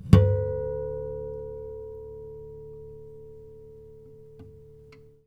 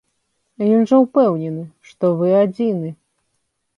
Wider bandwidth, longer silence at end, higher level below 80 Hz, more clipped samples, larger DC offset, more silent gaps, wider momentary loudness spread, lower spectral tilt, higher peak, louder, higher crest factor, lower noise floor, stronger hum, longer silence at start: first, 8.4 kHz vs 7.2 kHz; second, 0.5 s vs 0.85 s; first, -40 dBFS vs -68 dBFS; neither; neither; neither; first, 23 LU vs 15 LU; about the same, -9 dB/octave vs -9.5 dB/octave; about the same, 0 dBFS vs -2 dBFS; second, -28 LUFS vs -17 LUFS; first, 28 dB vs 16 dB; second, -51 dBFS vs -71 dBFS; neither; second, 0 s vs 0.6 s